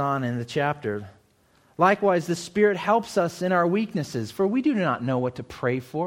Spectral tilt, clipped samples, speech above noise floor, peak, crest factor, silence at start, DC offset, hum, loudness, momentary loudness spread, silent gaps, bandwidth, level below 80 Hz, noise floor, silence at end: -6.5 dB/octave; under 0.1%; 37 dB; -6 dBFS; 18 dB; 0 s; under 0.1%; none; -24 LUFS; 9 LU; none; 16.5 kHz; -62 dBFS; -61 dBFS; 0 s